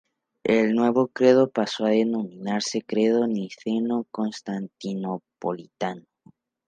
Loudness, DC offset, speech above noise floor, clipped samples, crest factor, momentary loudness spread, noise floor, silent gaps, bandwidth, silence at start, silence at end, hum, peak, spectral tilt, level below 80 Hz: -24 LUFS; under 0.1%; 34 dB; under 0.1%; 20 dB; 12 LU; -58 dBFS; none; 9.4 kHz; 0.45 s; 0.65 s; none; -4 dBFS; -5.5 dB/octave; -70 dBFS